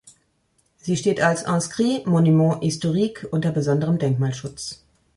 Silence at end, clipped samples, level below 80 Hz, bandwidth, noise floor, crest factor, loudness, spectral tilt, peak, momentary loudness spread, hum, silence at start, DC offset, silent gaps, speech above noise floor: 0.45 s; under 0.1%; -58 dBFS; 11.5 kHz; -66 dBFS; 16 dB; -21 LUFS; -6 dB/octave; -6 dBFS; 14 LU; none; 0.85 s; under 0.1%; none; 46 dB